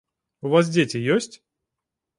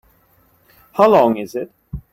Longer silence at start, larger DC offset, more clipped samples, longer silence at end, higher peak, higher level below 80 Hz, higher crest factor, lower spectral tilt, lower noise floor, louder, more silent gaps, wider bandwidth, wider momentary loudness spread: second, 0.45 s vs 0.95 s; neither; neither; first, 0.85 s vs 0.15 s; about the same, -4 dBFS vs -2 dBFS; second, -68 dBFS vs -44 dBFS; about the same, 20 dB vs 18 dB; second, -5.5 dB/octave vs -7 dB/octave; first, -85 dBFS vs -56 dBFS; second, -21 LUFS vs -15 LUFS; neither; second, 11.5 kHz vs 16.5 kHz; second, 13 LU vs 19 LU